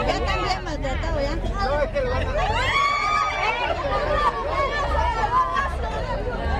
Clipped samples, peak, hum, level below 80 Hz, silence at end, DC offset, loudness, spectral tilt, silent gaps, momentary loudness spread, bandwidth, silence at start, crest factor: under 0.1%; -8 dBFS; none; -30 dBFS; 0 s; under 0.1%; -23 LUFS; -5 dB/octave; none; 7 LU; 10.5 kHz; 0 s; 14 dB